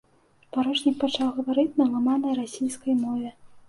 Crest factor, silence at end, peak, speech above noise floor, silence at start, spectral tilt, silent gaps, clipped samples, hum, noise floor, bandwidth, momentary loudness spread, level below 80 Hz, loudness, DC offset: 16 dB; 0.1 s; -10 dBFS; 36 dB; 0.55 s; -4 dB/octave; none; under 0.1%; none; -60 dBFS; 11.5 kHz; 7 LU; -66 dBFS; -25 LUFS; under 0.1%